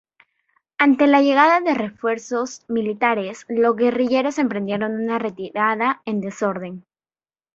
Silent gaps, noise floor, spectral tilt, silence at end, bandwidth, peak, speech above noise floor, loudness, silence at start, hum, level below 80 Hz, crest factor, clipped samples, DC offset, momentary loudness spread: none; under -90 dBFS; -5.5 dB/octave; 0.75 s; 7.8 kHz; -2 dBFS; over 71 dB; -20 LUFS; 0.8 s; none; -66 dBFS; 18 dB; under 0.1%; under 0.1%; 11 LU